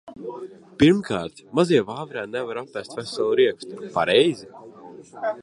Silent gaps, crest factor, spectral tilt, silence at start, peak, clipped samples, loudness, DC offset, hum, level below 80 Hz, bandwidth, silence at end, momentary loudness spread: none; 20 dB; -5.5 dB/octave; 0.05 s; -4 dBFS; under 0.1%; -22 LUFS; under 0.1%; none; -56 dBFS; 11.5 kHz; 0 s; 20 LU